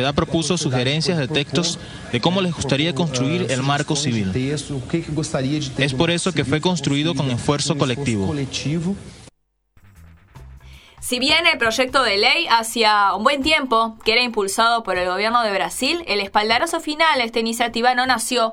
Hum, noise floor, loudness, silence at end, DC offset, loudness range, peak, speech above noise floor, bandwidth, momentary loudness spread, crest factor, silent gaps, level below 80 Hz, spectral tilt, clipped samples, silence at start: none; -58 dBFS; -19 LUFS; 0 s; under 0.1%; 6 LU; 0 dBFS; 39 dB; 17 kHz; 8 LU; 20 dB; none; -46 dBFS; -4 dB/octave; under 0.1%; 0 s